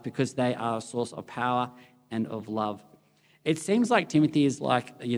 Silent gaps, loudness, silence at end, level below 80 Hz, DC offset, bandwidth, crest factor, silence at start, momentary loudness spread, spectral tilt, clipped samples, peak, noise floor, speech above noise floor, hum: none; -28 LUFS; 0 s; -74 dBFS; under 0.1%; over 20 kHz; 20 dB; 0.05 s; 11 LU; -5.5 dB/octave; under 0.1%; -8 dBFS; -63 dBFS; 36 dB; none